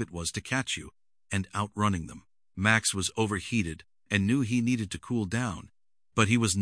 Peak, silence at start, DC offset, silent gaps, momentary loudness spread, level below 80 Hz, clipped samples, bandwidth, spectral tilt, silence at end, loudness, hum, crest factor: -6 dBFS; 0 s; under 0.1%; none; 11 LU; -54 dBFS; under 0.1%; 10.5 kHz; -4.5 dB/octave; 0 s; -29 LUFS; none; 24 dB